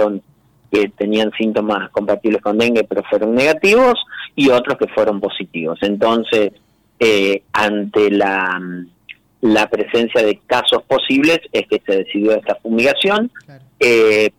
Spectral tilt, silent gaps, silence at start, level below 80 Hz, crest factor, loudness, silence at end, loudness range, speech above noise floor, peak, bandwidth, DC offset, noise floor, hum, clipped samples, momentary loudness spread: -4.5 dB/octave; none; 0 s; -54 dBFS; 10 dB; -15 LUFS; 0.1 s; 2 LU; 38 dB; -6 dBFS; 16.5 kHz; under 0.1%; -53 dBFS; none; under 0.1%; 8 LU